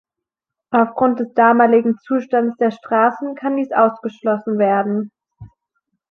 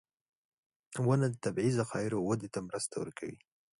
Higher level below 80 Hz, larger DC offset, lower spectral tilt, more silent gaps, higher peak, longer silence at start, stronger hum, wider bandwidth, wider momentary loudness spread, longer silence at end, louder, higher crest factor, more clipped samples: first, -62 dBFS vs -68 dBFS; neither; first, -8.5 dB/octave vs -6 dB/octave; neither; first, -2 dBFS vs -16 dBFS; second, 0.7 s vs 0.9 s; neither; second, 6.2 kHz vs 11.5 kHz; second, 9 LU vs 13 LU; first, 0.65 s vs 0.45 s; first, -17 LUFS vs -34 LUFS; about the same, 16 dB vs 18 dB; neither